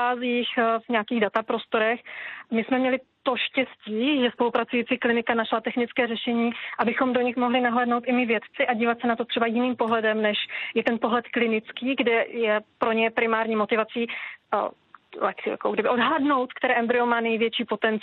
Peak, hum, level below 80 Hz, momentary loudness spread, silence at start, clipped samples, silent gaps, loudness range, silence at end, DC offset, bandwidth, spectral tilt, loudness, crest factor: -8 dBFS; none; -72 dBFS; 6 LU; 0 s; under 0.1%; none; 2 LU; 0 s; under 0.1%; 4.4 kHz; -7.5 dB/octave; -24 LUFS; 16 dB